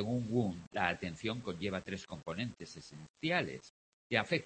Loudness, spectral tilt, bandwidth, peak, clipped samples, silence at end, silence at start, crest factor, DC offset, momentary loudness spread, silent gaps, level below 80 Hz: -37 LUFS; -5.5 dB/octave; 8.4 kHz; -14 dBFS; under 0.1%; 0 s; 0 s; 24 dB; under 0.1%; 15 LU; 0.67-0.71 s, 3.10-3.14 s, 3.70-4.10 s; -66 dBFS